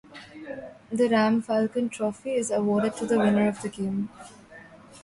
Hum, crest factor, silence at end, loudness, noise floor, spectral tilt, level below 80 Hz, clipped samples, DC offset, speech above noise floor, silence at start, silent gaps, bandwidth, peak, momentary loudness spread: none; 16 dB; 0.05 s; -25 LUFS; -48 dBFS; -6 dB/octave; -64 dBFS; under 0.1%; under 0.1%; 24 dB; 0.1 s; none; 11.5 kHz; -10 dBFS; 17 LU